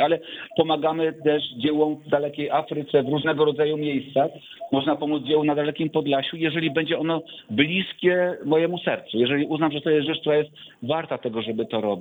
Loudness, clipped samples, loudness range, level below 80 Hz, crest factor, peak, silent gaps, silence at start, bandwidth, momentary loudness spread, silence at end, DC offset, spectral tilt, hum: -23 LUFS; under 0.1%; 1 LU; -66 dBFS; 18 dB; -4 dBFS; none; 0 s; over 20 kHz; 6 LU; 0 s; under 0.1%; -8 dB/octave; none